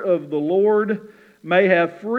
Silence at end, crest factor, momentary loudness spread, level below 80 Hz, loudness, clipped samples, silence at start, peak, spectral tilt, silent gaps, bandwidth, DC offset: 0 s; 16 dB; 7 LU; -76 dBFS; -19 LUFS; under 0.1%; 0 s; -4 dBFS; -8 dB/octave; none; 4.6 kHz; under 0.1%